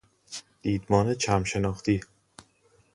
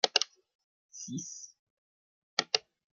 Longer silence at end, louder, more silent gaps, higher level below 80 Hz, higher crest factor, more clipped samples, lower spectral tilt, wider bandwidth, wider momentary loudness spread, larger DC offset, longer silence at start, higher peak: first, 0.95 s vs 0.35 s; first, -27 LUFS vs -33 LUFS; second, none vs 0.55-0.89 s, 1.59-2.37 s; first, -48 dBFS vs -86 dBFS; second, 22 dB vs 30 dB; neither; first, -5.5 dB/octave vs -1 dB/octave; about the same, 11.5 kHz vs 12 kHz; about the same, 16 LU vs 18 LU; neither; first, 0.3 s vs 0.05 s; about the same, -6 dBFS vs -6 dBFS